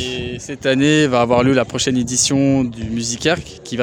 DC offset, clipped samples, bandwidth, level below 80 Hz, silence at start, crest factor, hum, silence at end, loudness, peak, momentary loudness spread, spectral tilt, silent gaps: under 0.1%; under 0.1%; 17 kHz; -44 dBFS; 0 s; 16 dB; none; 0 s; -17 LUFS; 0 dBFS; 9 LU; -4 dB/octave; none